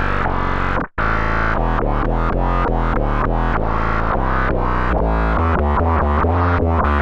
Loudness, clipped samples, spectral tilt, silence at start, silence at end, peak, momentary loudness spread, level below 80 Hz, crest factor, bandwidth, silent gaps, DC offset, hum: -19 LUFS; under 0.1%; -8.5 dB/octave; 0 s; 0 s; -4 dBFS; 3 LU; -20 dBFS; 14 dB; 6.2 kHz; none; under 0.1%; none